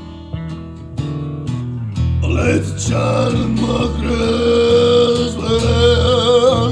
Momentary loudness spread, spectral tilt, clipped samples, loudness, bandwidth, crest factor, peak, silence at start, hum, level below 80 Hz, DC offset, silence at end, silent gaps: 15 LU; -6 dB/octave; under 0.1%; -15 LUFS; 10.5 kHz; 14 dB; -2 dBFS; 0 s; none; -28 dBFS; under 0.1%; 0 s; none